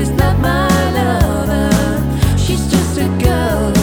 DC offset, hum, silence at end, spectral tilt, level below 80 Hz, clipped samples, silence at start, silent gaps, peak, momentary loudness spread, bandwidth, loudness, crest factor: under 0.1%; none; 0 s; -6 dB/octave; -22 dBFS; under 0.1%; 0 s; none; 0 dBFS; 2 LU; over 20 kHz; -14 LUFS; 12 dB